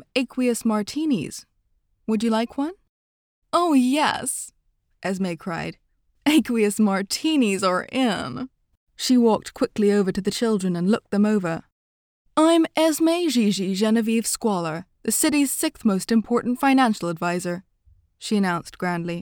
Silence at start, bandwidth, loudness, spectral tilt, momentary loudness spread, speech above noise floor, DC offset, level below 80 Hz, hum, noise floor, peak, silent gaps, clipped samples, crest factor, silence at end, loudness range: 0.15 s; 19.5 kHz; -22 LUFS; -4.5 dB/octave; 12 LU; 46 dB; under 0.1%; -60 dBFS; none; -67 dBFS; -6 dBFS; 2.89-3.42 s, 8.77-8.87 s, 11.72-12.25 s; under 0.1%; 16 dB; 0 s; 3 LU